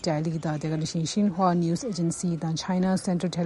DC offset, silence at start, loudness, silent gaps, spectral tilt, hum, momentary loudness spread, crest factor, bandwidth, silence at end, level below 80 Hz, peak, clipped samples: under 0.1%; 0 s; -27 LUFS; none; -6 dB/octave; none; 5 LU; 16 dB; 11.5 kHz; 0 s; -58 dBFS; -10 dBFS; under 0.1%